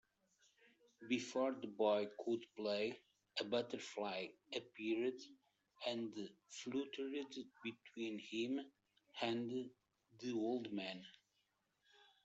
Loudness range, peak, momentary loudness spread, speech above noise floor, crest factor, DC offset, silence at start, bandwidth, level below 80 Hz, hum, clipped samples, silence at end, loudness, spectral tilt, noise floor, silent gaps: 5 LU; -24 dBFS; 12 LU; 41 dB; 22 dB; under 0.1%; 1 s; 8.2 kHz; -90 dBFS; none; under 0.1%; 1.15 s; -44 LUFS; -4.5 dB/octave; -84 dBFS; none